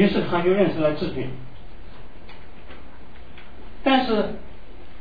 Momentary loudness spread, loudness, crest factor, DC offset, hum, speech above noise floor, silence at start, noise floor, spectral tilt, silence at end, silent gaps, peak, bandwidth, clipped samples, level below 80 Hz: 26 LU; -22 LUFS; 18 dB; 3%; none; 22 dB; 0 s; -44 dBFS; -8.5 dB/octave; 0.05 s; none; -6 dBFS; 5 kHz; under 0.1%; -44 dBFS